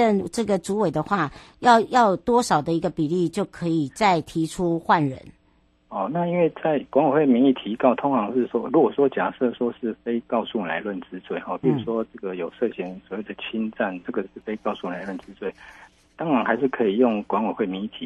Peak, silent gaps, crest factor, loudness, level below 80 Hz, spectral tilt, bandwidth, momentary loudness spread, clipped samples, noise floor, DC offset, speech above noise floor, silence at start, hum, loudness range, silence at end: -4 dBFS; none; 20 dB; -23 LUFS; -58 dBFS; -6 dB/octave; 12.5 kHz; 13 LU; under 0.1%; -61 dBFS; under 0.1%; 39 dB; 0 s; none; 8 LU; 0 s